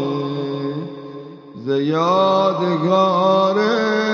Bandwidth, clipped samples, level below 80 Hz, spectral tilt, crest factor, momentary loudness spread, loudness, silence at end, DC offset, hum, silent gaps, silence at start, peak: 7.2 kHz; under 0.1%; -70 dBFS; -6.5 dB/octave; 14 dB; 17 LU; -17 LUFS; 0 s; under 0.1%; none; none; 0 s; -4 dBFS